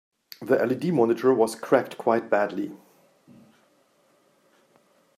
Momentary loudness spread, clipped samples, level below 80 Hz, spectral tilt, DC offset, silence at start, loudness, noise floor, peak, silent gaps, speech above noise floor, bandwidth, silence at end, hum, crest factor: 10 LU; under 0.1%; -78 dBFS; -6.5 dB/octave; under 0.1%; 0.4 s; -24 LUFS; -64 dBFS; -6 dBFS; none; 41 dB; 15 kHz; 2.4 s; none; 20 dB